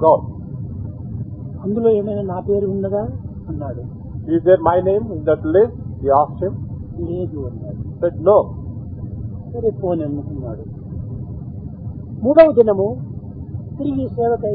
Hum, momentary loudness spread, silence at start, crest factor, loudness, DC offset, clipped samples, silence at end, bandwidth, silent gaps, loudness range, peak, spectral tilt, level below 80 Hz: none; 16 LU; 0 s; 18 dB; -19 LUFS; under 0.1%; under 0.1%; 0 s; 4.9 kHz; none; 4 LU; 0 dBFS; -12.5 dB/octave; -40 dBFS